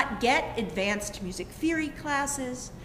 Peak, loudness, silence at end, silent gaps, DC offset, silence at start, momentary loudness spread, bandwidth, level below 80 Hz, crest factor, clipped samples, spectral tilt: -10 dBFS; -29 LUFS; 0 s; none; under 0.1%; 0 s; 11 LU; 16 kHz; -48 dBFS; 20 dB; under 0.1%; -3.5 dB/octave